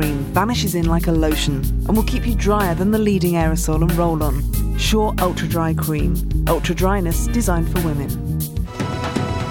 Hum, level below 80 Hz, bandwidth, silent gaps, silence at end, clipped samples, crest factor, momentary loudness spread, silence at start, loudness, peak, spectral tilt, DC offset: none; -24 dBFS; 20 kHz; none; 0 s; under 0.1%; 16 dB; 5 LU; 0 s; -19 LUFS; -2 dBFS; -5.5 dB/octave; under 0.1%